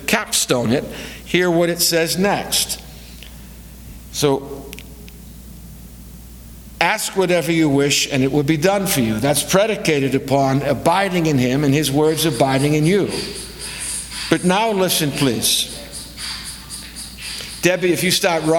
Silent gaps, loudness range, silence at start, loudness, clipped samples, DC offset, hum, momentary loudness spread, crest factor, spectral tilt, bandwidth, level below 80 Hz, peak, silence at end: none; 7 LU; 0 s; -17 LUFS; under 0.1%; under 0.1%; none; 22 LU; 18 dB; -4 dB/octave; 19.5 kHz; -42 dBFS; 0 dBFS; 0 s